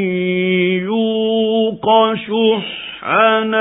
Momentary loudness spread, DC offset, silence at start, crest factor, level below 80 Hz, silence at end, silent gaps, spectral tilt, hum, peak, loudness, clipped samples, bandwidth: 5 LU; under 0.1%; 0 s; 16 dB; -58 dBFS; 0 s; none; -10 dB/octave; none; 0 dBFS; -15 LUFS; under 0.1%; 4 kHz